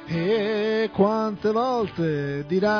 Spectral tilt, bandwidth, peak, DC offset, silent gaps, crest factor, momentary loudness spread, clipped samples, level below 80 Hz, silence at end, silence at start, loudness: -7.5 dB/octave; 5.4 kHz; -6 dBFS; under 0.1%; none; 16 dB; 4 LU; under 0.1%; -56 dBFS; 0 s; 0 s; -24 LUFS